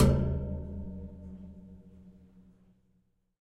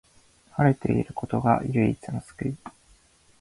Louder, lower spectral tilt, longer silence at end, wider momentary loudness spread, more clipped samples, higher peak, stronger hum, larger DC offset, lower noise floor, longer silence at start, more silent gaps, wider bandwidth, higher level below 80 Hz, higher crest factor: second, -35 LUFS vs -26 LUFS; about the same, -8 dB/octave vs -9 dB/octave; first, 1.3 s vs 0.7 s; first, 25 LU vs 13 LU; neither; about the same, -10 dBFS vs -8 dBFS; neither; neither; first, -72 dBFS vs -59 dBFS; second, 0 s vs 0.55 s; neither; first, 13 kHz vs 11.5 kHz; first, -40 dBFS vs -50 dBFS; about the same, 22 dB vs 20 dB